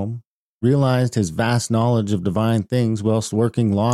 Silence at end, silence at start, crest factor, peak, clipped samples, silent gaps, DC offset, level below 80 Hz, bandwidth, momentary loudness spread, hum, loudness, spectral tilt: 0 s; 0 s; 12 dB; -6 dBFS; under 0.1%; 0.27-0.61 s; under 0.1%; -52 dBFS; 13 kHz; 4 LU; none; -20 LUFS; -6.5 dB/octave